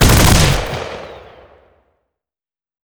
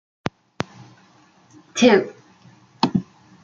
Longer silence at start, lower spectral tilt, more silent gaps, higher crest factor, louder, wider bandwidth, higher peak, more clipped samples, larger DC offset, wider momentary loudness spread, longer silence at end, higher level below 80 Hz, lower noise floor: second, 0 s vs 1.75 s; about the same, -4 dB/octave vs -5 dB/octave; neither; second, 16 dB vs 22 dB; first, -13 LUFS vs -21 LUFS; first, over 20 kHz vs 7.6 kHz; about the same, 0 dBFS vs -2 dBFS; neither; neither; first, 22 LU vs 17 LU; first, 1.7 s vs 0.4 s; first, -22 dBFS vs -60 dBFS; first, under -90 dBFS vs -54 dBFS